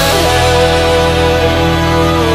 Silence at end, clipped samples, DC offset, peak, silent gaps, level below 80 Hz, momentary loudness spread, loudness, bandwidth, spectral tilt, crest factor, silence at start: 0 s; under 0.1%; under 0.1%; 0 dBFS; none; -22 dBFS; 2 LU; -10 LUFS; 16 kHz; -4.5 dB/octave; 10 dB; 0 s